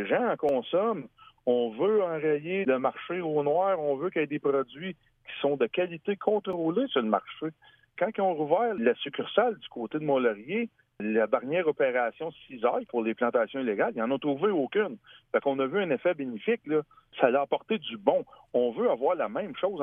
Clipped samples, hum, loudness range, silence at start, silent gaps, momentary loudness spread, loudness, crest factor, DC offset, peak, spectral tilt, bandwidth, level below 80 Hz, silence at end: under 0.1%; none; 1 LU; 0 s; none; 8 LU; -28 LUFS; 20 dB; under 0.1%; -8 dBFS; -8.5 dB/octave; 3.8 kHz; -74 dBFS; 0 s